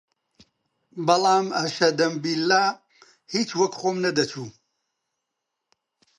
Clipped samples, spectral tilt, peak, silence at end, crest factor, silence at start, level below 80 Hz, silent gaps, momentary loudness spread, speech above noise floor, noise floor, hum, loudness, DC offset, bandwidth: under 0.1%; -4 dB/octave; -4 dBFS; 1.7 s; 22 dB; 0.95 s; -74 dBFS; none; 13 LU; 59 dB; -82 dBFS; none; -23 LUFS; under 0.1%; 11.5 kHz